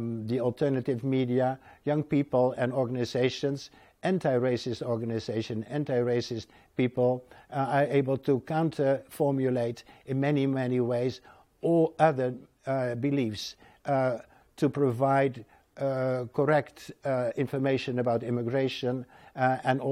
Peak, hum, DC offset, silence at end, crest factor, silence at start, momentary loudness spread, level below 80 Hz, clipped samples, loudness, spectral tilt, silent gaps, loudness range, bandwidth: -8 dBFS; none; under 0.1%; 0 s; 20 dB; 0 s; 10 LU; -68 dBFS; under 0.1%; -29 LUFS; -7.5 dB/octave; none; 2 LU; 15 kHz